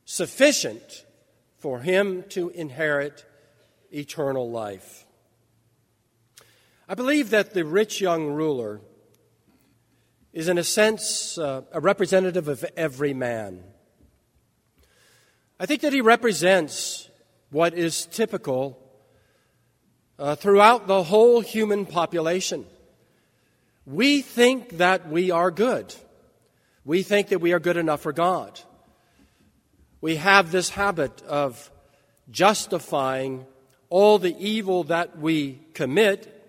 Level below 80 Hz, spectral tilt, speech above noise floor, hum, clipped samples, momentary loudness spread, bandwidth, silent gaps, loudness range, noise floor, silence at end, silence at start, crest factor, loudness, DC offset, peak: -64 dBFS; -4 dB/octave; 45 dB; none; under 0.1%; 15 LU; 16 kHz; none; 8 LU; -67 dBFS; 0.25 s; 0.1 s; 24 dB; -22 LUFS; under 0.1%; 0 dBFS